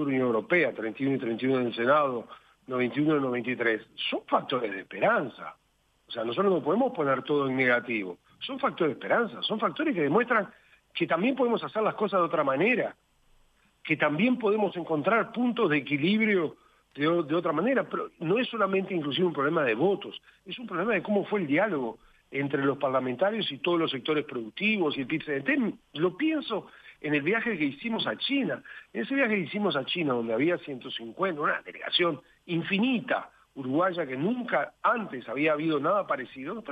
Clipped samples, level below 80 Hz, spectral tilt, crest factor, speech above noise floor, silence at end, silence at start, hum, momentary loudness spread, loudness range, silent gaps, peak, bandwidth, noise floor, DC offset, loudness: under 0.1%; -72 dBFS; -7.5 dB/octave; 18 dB; 39 dB; 0 s; 0 s; none; 10 LU; 2 LU; none; -10 dBFS; 8.2 kHz; -66 dBFS; under 0.1%; -28 LUFS